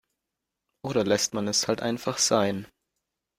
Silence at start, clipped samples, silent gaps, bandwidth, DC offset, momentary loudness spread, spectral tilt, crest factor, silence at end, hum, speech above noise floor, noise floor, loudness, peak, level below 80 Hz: 0.85 s; under 0.1%; none; 16 kHz; under 0.1%; 7 LU; -3 dB/octave; 20 dB; 0.75 s; none; 59 dB; -85 dBFS; -25 LUFS; -8 dBFS; -64 dBFS